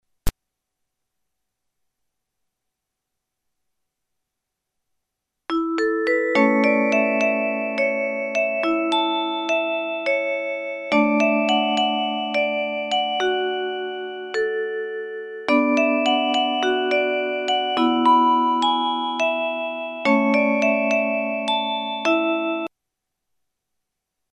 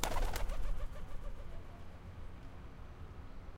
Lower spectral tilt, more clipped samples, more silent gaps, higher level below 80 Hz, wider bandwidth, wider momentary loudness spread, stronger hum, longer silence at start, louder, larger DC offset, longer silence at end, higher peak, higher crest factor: about the same, -4 dB/octave vs -4 dB/octave; neither; neither; about the same, -46 dBFS vs -42 dBFS; second, 13 kHz vs 16.5 kHz; second, 9 LU vs 12 LU; neither; first, 0.25 s vs 0 s; first, -21 LUFS vs -47 LUFS; neither; first, 1.65 s vs 0 s; first, -6 dBFS vs -12 dBFS; second, 18 dB vs 26 dB